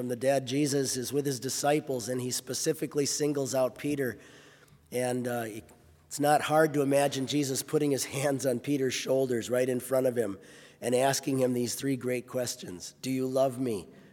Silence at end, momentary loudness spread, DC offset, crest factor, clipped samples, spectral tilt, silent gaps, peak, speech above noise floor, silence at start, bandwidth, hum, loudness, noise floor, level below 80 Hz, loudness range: 0.1 s; 9 LU; under 0.1%; 20 dB; under 0.1%; -4.5 dB/octave; none; -10 dBFS; 28 dB; 0 s; 18 kHz; none; -29 LUFS; -57 dBFS; -72 dBFS; 4 LU